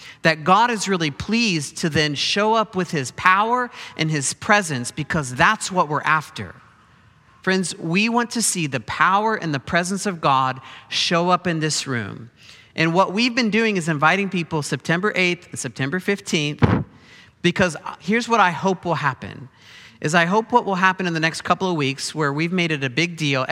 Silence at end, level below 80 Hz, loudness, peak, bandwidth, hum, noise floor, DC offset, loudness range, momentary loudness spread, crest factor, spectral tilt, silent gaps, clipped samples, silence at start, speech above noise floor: 0 s; -52 dBFS; -20 LUFS; 0 dBFS; 15 kHz; none; -53 dBFS; under 0.1%; 2 LU; 8 LU; 20 dB; -4 dB/octave; none; under 0.1%; 0 s; 32 dB